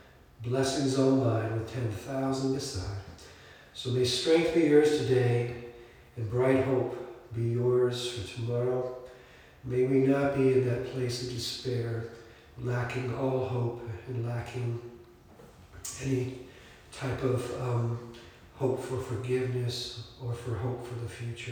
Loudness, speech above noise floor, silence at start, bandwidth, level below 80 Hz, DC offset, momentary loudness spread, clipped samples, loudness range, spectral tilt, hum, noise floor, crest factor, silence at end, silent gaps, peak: -30 LUFS; 24 dB; 0.4 s; 18.5 kHz; -58 dBFS; under 0.1%; 17 LU; under 0.1%; 7 LU; -6 dB/octave; none; -54 dBFS; 20 dB; 0 s; none; -10 dBFS